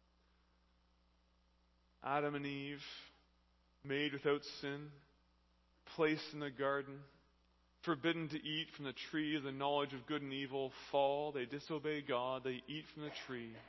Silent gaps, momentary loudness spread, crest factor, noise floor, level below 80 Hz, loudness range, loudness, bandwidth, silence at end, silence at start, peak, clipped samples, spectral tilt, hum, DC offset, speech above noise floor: none; 11 LU; 22 dB; -75 dBFS; -76 dBFS; 5 LU; -41 LUFS; 6 kHz; 0 s; 2 s; -22 dBFS; under 0.1%; -3 dB/octave; 60 Hz at -75 dBFS; under 0.1%; 34 dB